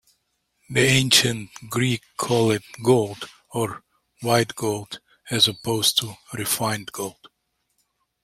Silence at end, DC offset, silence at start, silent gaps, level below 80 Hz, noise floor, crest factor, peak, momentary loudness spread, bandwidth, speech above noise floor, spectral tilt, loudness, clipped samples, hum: 1.1 s; under 0.1%; 0.7 s; none; -58 dBFS; -74 dBFS; 22 dB; -2 dBFS; 16 LU; 16.5 kHz; 51 dB; -3.5 dB/octave; -22 LUFS; under 0.1%; none